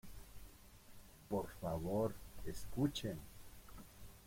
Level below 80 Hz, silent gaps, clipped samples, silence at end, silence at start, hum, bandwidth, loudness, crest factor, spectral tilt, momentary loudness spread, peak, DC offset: -58 dBFS; none; under 0.1%; 0 s; 0.05 s; none; 16.5 kHz; -43 LUFS; 20 dB; -6 dB/octave; 22 LU; -24 dBFS; under 0.1%